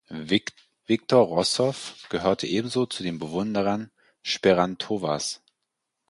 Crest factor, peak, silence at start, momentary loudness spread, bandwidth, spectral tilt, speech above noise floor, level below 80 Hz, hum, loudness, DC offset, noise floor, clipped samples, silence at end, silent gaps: 20 dB; -6 dBFS; 0.1 s; 11 LU; 11.5 kHz; -4.5 dB/octave; 57 dB; -58 dBFS; none; -25 LUFS; under 0.1%; -81 dBFS; under 0.1%; 0.75 s; none